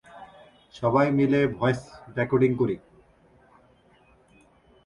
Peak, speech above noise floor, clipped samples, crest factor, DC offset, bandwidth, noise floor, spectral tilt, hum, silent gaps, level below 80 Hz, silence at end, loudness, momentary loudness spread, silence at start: -8 dBFS; 36 dB; under 0.1%; 18 dB; under 0.1%; 11 kHz; -59 dBFS; -8 dB/octave; none; none; -58 dBFS; 2.1 s; -24 LUFS; 15 LU; 0.15 s